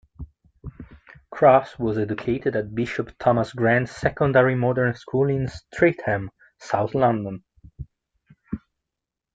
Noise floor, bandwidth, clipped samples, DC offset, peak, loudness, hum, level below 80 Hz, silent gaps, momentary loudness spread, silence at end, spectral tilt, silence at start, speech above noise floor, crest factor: -85 dBFS; 7.8 kHz; under 0.1%; under 0.1%; -2 dBFS; -22 LUFS; none; -50 dBFS; none; 24 LU; 0.8 s; -8 dB/octave; 0.2 s; 64 dB; 20 dB